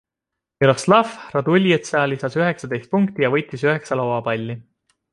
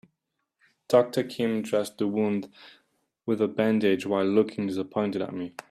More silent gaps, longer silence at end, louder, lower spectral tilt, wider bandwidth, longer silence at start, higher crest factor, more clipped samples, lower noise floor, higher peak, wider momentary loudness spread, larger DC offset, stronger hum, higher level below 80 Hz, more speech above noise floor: neither; first, 0.5 s vs 0.1 s; first, -19 LUFS vs -26 LUFS; about the same, -6 dB/octave vs -6.5 dB/octave; second, 11.5 kHz vs 14.5 kHz; second, 0.6 s vs 0.9 s; about the same, 18 dB vs 20 dB; neither; about the same, -84 dBFS vs -81 dBFS; first, -2 dBFS vs -8 dBFS; about the same, 8 LU vs 9 LU; neither; neither; first, -60 dBFS vs -74 dBFS; first, 65 dB vs 55 dB